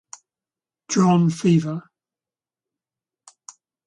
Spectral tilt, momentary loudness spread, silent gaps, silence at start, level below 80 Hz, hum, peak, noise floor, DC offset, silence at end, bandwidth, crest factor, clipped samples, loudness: -6.5 dB/octave; 13 LU; none; 0.9 s; -64 dBFS; none; -6 dBFS; under -90 dBFS; under 0.1%; 2.05 s; 10.5 kHz; 18 dB; under 0.1%; -19 LUFS